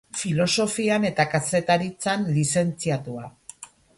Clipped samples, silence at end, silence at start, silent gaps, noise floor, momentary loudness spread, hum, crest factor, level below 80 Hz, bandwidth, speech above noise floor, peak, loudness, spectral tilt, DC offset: under 0.1%; 0.35 s; 0.15 s; none; -46 dBFS; 15 LU; none; 18 dB; -60 dBFS; 11.5 kHz; 22 dB; -6 dBFS; -23 LUFS; -4.5 dB/octave; under 0.1%